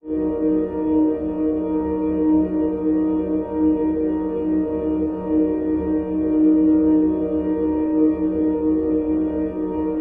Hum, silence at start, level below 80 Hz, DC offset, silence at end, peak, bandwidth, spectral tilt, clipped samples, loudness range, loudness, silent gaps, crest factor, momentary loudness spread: none; 0.05 s; -42 dBFS; under 0.1%; 0 s; -8 dBFS; 3 kHz; -12 dB/octave; under 0.1%; 2 LU; -20 LUFS; none; 12 dB; 6 LU